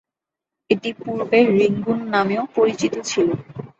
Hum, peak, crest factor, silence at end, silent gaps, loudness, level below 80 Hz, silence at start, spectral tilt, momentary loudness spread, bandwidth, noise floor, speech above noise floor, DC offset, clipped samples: none; -2 dBFS; 18 dB; 0.1 s; none; -20 LUFS; -60 dBFS; 0.7 s; -5.5 dB/octave; 8 LU; 8 kHz; -86 dBFS; 67 dB; under 0.1%; under 0.1%